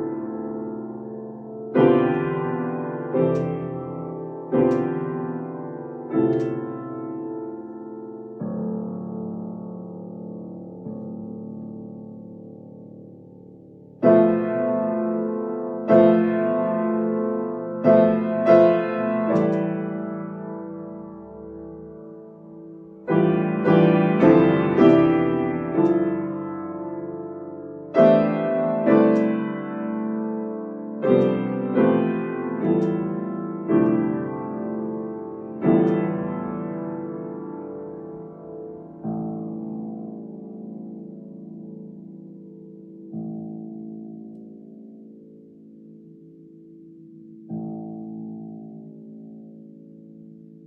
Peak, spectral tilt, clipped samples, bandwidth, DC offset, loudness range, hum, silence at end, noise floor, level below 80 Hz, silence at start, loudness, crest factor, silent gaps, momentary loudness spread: -4 dBFS; -10 dB/octave; under 0.1%; 5.8 kHz; under 0.1%; 19 LU; none; 0.05 s; -46 dBFS; -62 dBFS; 0 s; -22 LUFS; 20 dB; none; 23 LU